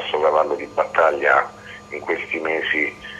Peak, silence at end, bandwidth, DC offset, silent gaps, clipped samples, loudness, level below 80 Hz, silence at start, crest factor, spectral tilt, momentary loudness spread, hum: -4 dBFS; 0 s; 10.5 kHz; under 0.1%; none; under 0.1%; -20 LUFS; -58 dBFS; 0 s; 18 dB; -4 dB/octave; 14 LU; none